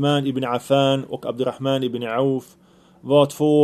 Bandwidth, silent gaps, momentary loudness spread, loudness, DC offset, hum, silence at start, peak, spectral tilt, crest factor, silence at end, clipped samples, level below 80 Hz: 13.5 kHz; none; 8 LU; -21 LUFS; under 0.1%; none; 0 s; -2 dBFS; -6.5 dB/octave; 18 dB; 0 s; under 0.1%; -64 dBFS